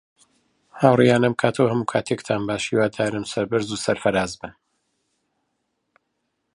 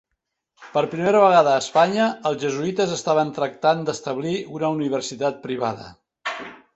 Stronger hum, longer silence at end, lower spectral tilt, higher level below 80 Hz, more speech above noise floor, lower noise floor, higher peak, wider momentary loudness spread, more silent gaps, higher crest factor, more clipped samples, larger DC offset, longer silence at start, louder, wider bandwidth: neither; first, 2.05 s vs 0.2 s; about the same, -5.5 dB/octave vs -5 dB/octave; first, -56 dBFS vs -64 dBFS; second, 54 dB vs 58 dB; about the same, -75 dBFS vs -78 dBFS; about the same, -2 dBFS vs -2 dBFS; second, 9 LU vs 12 LU; neither; about the same, 22 dB vs 20 dB; neither; neither; first, 0.75 s vs 0.6 s; about the same, -21 LUFS vs -21 LUFS; first, 11.5 kHz vs 8.2 kHz